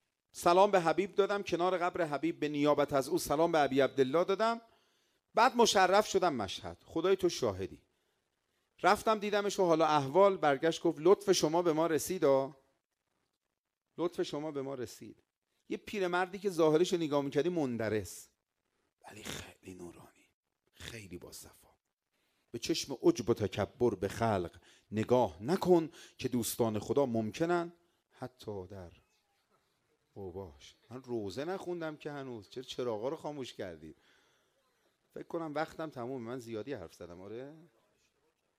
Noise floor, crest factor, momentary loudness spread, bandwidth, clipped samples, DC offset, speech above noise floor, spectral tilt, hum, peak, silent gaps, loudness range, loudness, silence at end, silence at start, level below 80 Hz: -89 dBFS; 22 dB; 20 LU; 16 kHz; under 0.1%; under 0.1%; 57 dB; -5 dB/octave; none; -12 dBFS; 12.85-12.89 s, 13.37-13.41 s, 13.58-13.64 s, 15.37-15.42 s, 20.34-20.43 s, 21.93-21.97 s; 14 LU; -32 LUFS; 1 s; 0.35 s; -68 dBFS